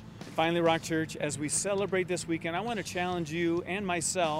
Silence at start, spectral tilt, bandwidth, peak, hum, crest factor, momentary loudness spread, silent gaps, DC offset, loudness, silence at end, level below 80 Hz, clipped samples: 0 s; -4 dB/octave; 16 kHz; -12 dBFS; none; 18 dB; 6 LU; none; under 0.1%; -30 LUFS; 0 s; -60 dBFS; under 0.1%